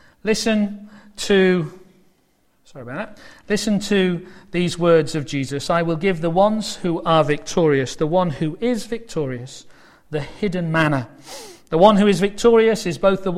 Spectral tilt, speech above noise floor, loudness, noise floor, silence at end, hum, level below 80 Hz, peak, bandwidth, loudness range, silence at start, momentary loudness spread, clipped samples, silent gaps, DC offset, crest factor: -5.5 dB/octave; 42 dB; -19 LUFS; -61 dBFS; 0 s; none; -46 dBFS; 0 dBFS; 15 kHz; 6 LU; 0.25 s; 16 LU; under 0.1%; none; under 0.1%; 20 dB